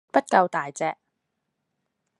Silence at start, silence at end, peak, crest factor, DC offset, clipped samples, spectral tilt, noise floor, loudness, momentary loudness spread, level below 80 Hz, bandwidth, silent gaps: 0.15 s; 1.25 s; -4 dBFS; 24 dB; under 0.1%; under 0.1%; -4.5 dB/octave; -79 dBFS; -24 LUFS; 11 LU; -82 dBFS; 11 kHz; none